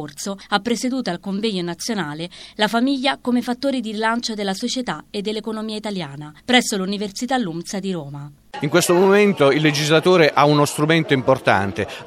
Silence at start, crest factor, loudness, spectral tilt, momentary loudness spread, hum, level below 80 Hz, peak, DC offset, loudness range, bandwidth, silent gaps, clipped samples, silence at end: 0 s; 18 dB; -19 LUFS; -4.5 dB/octave; 13 LU; none; -58 dBFS; 0 dBFS; under 0.1%; 7 LU; 16 kHz; none; under 0.1%; 0 s